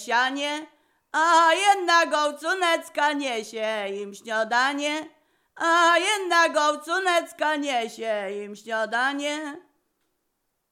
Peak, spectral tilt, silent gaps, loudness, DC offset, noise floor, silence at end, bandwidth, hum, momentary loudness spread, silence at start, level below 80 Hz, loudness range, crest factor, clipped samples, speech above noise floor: -6 dBFS; -1 dB/octave; none; -23 LUFS; under 0.1%; -76 dBFS; 1.1 s; 16 kHz; none; 11 LU; 0 s; -86 dBFS; 5 LU; 18 dB; under 0.1%; 53 dB